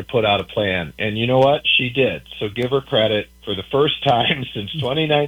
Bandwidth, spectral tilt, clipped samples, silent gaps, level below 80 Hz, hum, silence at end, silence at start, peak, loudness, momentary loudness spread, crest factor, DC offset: 19 kHz; -6.5 dB/octave; under 0.1%; none; -48 dBFS; none; 0 s; 0 s; -2 dBFS; -19 LUFS; 9 LU; 16 dB; under 0.1%